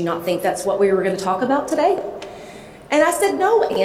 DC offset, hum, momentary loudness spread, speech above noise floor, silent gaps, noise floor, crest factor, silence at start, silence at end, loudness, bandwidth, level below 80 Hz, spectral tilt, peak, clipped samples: under 0.1%; none; 18 LU; 20 dB; none; -38 dBFS; 16 dB; 0 s; 0 s; -19 LUFS; 16 kHz; -56 dBFS; -4.5 dB/octave; -4 dBFS; under 0.1%